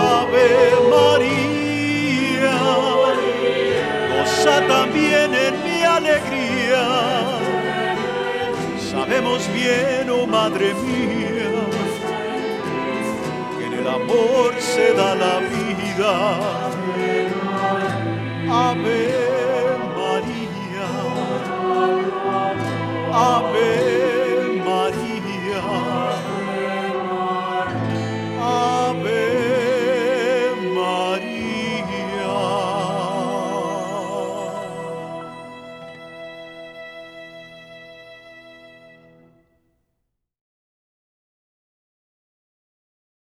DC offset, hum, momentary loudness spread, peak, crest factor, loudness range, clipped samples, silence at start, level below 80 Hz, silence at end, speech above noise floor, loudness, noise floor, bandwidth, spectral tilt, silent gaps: under 0.1%; none; 11 LU; -4 dBFS; 18 dB; 10 LU; under 0.1%; 0 s; -56 dBFS; 4.55 s; 58 dB; -20 LUFS; -76 dBFS; 14 kHz; -5 dB/octave; none